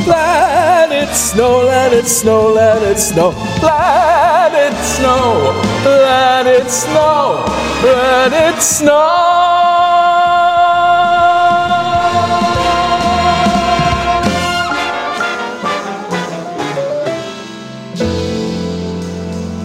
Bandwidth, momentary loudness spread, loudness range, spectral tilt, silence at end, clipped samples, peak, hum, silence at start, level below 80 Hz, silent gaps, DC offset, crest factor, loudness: 16.5 kHz; 10 LU; 9 LU; -3.5 dB/octave; 0 s; under 0.1%; 0 dBFS; none; 0 s; -34 dBFS; none; 0.2%; 12 dB; -11 LUFS